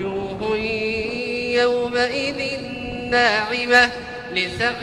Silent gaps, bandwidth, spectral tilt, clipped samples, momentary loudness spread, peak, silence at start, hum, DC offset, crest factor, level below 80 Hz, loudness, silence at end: none; 12.5 kHz; -4 dB/octave; under 0.1%; 11 LU; -2 dBFS; 0 s; none; under 0.1%; 20 dB; -48 dBFS; -20 LUFS; 0 s